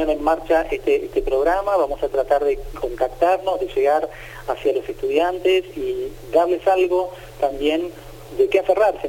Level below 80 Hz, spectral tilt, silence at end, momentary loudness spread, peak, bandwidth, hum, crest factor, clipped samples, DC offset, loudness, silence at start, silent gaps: -40 dBFS; -5 dB/octave; 0 s; 9 LU; -4 dBFS; 17 kHz; none; 16 dB; under 0.1%; under 0.1%; -20 LUFS; 0 s; none